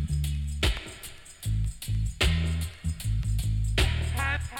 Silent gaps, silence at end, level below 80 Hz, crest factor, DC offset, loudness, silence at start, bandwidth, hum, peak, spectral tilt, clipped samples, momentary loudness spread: none; 0 s; -32 dBFS; 18 dB; under 0.1%; -29 LUFS; 0 s; 17.5 kHz; none; -10 dBFS; -4.5 dB/octave; under 0.1%; 10 LU